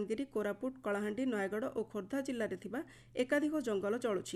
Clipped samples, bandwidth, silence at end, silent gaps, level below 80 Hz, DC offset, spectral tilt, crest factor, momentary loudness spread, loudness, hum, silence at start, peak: under 0.1%; 13 kHz; 0 s; none; -72 dBFS; under 0.1%; -5 dB/octave; 16 dB; 8 LU; -37 LUFS; none; 0 s; -20 dBFS